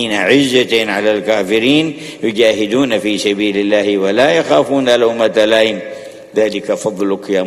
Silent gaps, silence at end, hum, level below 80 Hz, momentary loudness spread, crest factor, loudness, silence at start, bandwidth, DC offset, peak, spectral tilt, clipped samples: none; 0 s; none; -54 dBFS; 8 LU; 14 dB; -13 LUFS; 0 s; 13.5 kHz; under 0.1%; 0 dBFS; -4 dB/octave; under 0.1%